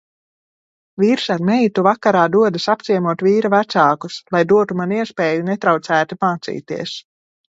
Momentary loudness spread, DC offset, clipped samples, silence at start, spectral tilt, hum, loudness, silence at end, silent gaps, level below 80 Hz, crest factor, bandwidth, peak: 11 LU; under 0.1%; under 0.1%; 1 s; -6 dB/octave; none; -17 LUFS; 0.55 s; none; -64 dBFS; 16 dB; 8 kHz; 0 dBFS